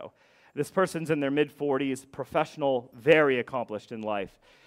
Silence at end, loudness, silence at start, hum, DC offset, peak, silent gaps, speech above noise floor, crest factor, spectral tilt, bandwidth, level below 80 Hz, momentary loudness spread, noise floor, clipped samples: 0.4 s; -28 LUFS; 0 s; none; under 0.1%; -6 dBFS; none; 23 dB; 22 dB; -5.5 dB/octave; 15.5 kHz; -68 dBFS; 14 LU; -50 dBFS; under 0.1%